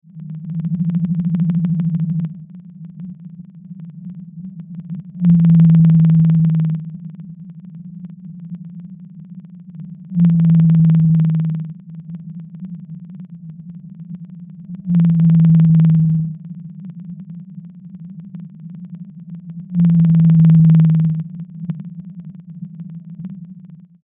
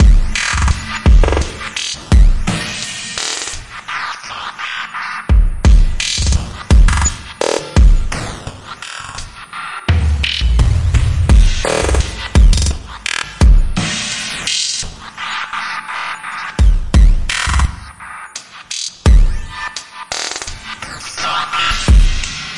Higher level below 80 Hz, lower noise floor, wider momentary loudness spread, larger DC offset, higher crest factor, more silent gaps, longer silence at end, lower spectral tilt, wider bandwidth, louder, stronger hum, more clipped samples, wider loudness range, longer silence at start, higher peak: second, -50 dBFS vs -14 dBFS; first, -40 dBFS vs -32 dBFS; first, 25 LU vs 14 LU; neither; about the same, 12 dB vs 12 dB; neither; first, 0.3 s vs 0 s; first, -12.5 dB/octave vs -4 dB/octave; second, 2.1 kHz vs 11.5 kHz; about the same, -14 LUFS vs -16 LUFS; neither; neither; first, 14 LU vs 4 LU; first, 0.15 s vs 0 s; about the same, -4 dBFS vs -2 dBFS